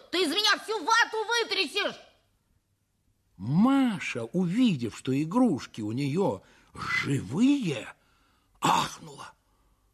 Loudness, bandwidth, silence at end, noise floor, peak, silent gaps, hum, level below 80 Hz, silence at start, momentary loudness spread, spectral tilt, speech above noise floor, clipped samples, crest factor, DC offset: -27 LUFS; 14 kHz; 0.65 s; -73 dBFS; -10 dBFS; none; none; -64 dBFS; 0.1 s; 12 LU; -4.5 dB/octave; 47 dB; under 0.1%; 20 dB; under 0.1%